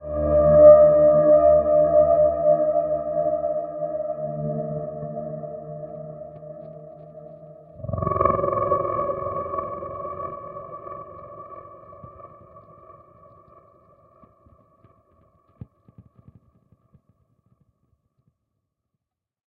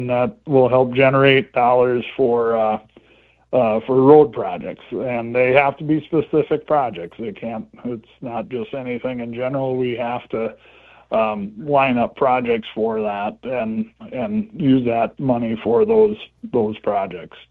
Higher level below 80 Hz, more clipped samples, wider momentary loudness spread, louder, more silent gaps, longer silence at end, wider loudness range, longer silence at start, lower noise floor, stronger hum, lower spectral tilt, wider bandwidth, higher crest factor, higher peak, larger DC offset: first, -48 dBFS vs -54 dBFS; neither; first, 25 LU vs 14 LU; about the same, -19 LUFS vs -19 LUFS; neither; first, 7.25 s vs 0.25 s; first, 23 LU vs 8 LU; about the same, 0 s vs 0 s; first, -82 dBFS vs -54 dBFS; neither; about the same, -10.5 dB/octave vs -9.5 dB/octave; second, 2.5 kHz vs 4.4 kHz; about the same, 22 dB vs 18 dB; about the same, -2 dBFS vs 0 dBFS; neither